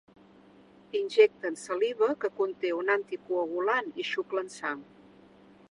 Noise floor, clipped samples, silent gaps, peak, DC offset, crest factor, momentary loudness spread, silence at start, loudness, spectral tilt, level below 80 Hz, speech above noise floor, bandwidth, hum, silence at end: -56 dBFS; under 0.1%; none; -8 dBFS; under 0.1%; 22 dB; 12 LU; 0.95 s; -29 LUFS; -3.5 dB/octave; -78 dBFS; 28 dB; 11 kHz; none; 0.9 s